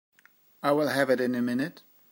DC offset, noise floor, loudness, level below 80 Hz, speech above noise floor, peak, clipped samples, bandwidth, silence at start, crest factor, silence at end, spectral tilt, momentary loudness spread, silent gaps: under 0.1%; -61 dBFS; -27 LUFS; -78 dBFS; 35 dB; -10 dBFS; under 0.1%; 16 kHz; 0.65 s; 18 dB; 0.35 s; -5.5 dB/octave; 7 LU; none